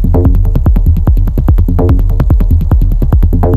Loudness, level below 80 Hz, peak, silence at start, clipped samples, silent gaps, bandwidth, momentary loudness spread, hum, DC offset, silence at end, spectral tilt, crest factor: -11 LUFS; -10 dBFS; 0 dBFS; 0 s; under 0.1%; none; 13 kHz; 1 LU; none; under 0.1%; 0 s; -10.5 dB/octave; 6 dB